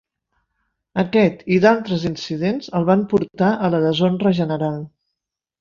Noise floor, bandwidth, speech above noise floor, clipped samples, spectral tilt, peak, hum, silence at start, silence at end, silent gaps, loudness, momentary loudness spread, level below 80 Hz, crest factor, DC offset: -82 dBFS; 7.2 kHz; 64 dB; under 0.1%; -7.5 dB/octave; -2 dBFS; none; 0.95 s; 0.75 s; none; -19 LUFS; 9 LU; -54 dBFS; 18 dB; under 0.1%